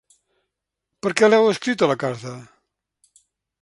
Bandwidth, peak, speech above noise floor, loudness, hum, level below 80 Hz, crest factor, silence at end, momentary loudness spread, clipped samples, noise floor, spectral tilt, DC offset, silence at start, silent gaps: 11.5 kHz; 0 dBFS; 62 dB; -19 LUFS; none; -68 dBFS; 22 dB; 1.2 s; 19 LU; under 0.1%; -81 dBFS; -4.5 dB/octave; under 0.1%; 1.05 s; none